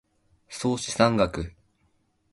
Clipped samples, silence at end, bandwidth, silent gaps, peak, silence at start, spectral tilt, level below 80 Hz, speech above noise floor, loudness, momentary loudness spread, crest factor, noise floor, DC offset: under 0.1%; 0.8 s; 11.5 kHz; none; -6 dBFS; 0.5 s; -5 dB/octave; -48 dBFS; 44 dB; -25 LUFS; 17 LU; 22 dB; -69 dBFS; under 0.1%